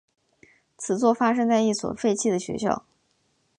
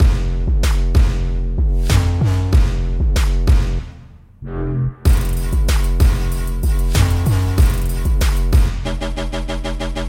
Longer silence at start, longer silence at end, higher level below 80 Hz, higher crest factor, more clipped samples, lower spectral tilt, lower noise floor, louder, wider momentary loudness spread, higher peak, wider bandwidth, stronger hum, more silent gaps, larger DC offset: first, 0.8 s vs 0 s; first, 0.8 s vs 0 s; second, -62 dBFS vs -16 dBFS; about the same, 18 dB vs 14 dB; neither; second, -4.5 dB/octave vs -6 dB/octave; first, -69 dBFS vs -40 dBFS; second, -24 LUFS vs -18 LUFS; about the same, 8 LU vs 8 LU; second, -6 dBFS vs -2 dBFS; second, 11 kHz vs 17 kHz; neither; neither; neither